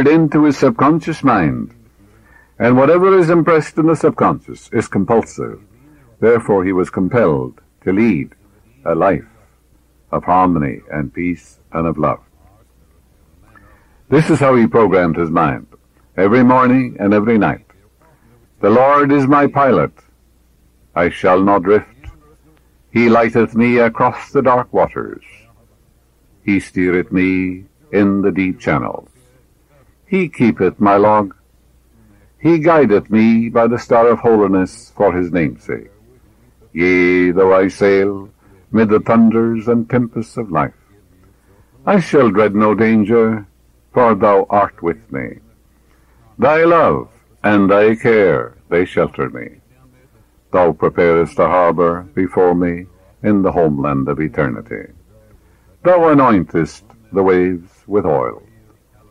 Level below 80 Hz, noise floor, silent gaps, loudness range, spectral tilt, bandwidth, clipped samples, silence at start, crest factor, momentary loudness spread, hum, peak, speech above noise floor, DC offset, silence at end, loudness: -46 dBFS; -53 dBFS; none; 5 LU; -8 dB/octave; 11 kHz; under 0.1%; 0 s; 12 dB; 13 LU; none; -2 dBFS; 40 dB; under 0.1%; 0.75 s; -14 LUFS